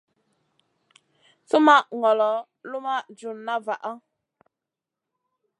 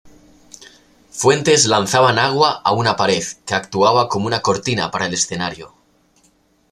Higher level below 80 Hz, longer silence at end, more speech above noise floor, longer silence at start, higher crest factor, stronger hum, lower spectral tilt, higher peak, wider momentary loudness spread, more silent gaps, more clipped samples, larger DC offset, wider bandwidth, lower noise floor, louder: second, -90 dBFS vs -54 dBFS; first, 1.6 s vs 1.05 s; first, 65 dB vs 41 dB; first, 1.55 s vs 0.6 s; first, 24 dB vs 18 dB; neither; about the same, -3.5 dB/octave vs -3 dB/octave; about the same, -2 dBFS vs 0 dBFS; first, 19 LU vs 9 LU; neither; neither; neither; second, 11 kHz vs 15 kHz; first, -87 dBFS vs -58 dBFS; second, -22 LUFS vs -16 LUFS